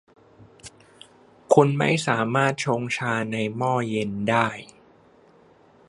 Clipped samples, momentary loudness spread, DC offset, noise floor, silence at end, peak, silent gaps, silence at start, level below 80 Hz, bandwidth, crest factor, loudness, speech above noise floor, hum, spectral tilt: under 0.1%; 8 LU; under 0.1%; -55 dBFS; 1.25 s; -2 dBFS; none; 0.4 s; -64 dBFS; 11.5 kHz; 22 dB; -23 LUFS; 32 dB; none; -5.5 dB/octave